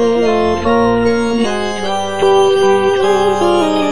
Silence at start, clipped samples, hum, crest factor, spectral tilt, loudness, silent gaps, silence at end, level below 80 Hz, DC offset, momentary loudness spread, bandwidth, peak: 0 s; under 0.1%; none; 12 dB; -5 dB/octave; -13 LUFS; none; 0 s; -40 dBFS; 3%; 6 LU; 10.5 kHz; 0 dBFS